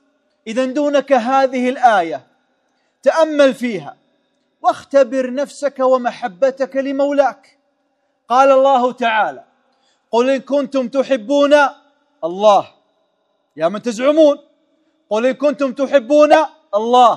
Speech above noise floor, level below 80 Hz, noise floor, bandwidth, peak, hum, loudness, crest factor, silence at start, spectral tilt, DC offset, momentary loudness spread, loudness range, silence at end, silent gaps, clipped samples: 51 dB; -70 dBFS; -65 dBFS; 11 kHz; 0 dBFS; none; -15 LUFS; 16 dB; 0.45 s; -4 dB/octave; under 0.1%; 10 LU; 3 LU; 0 s; none; under 0.1%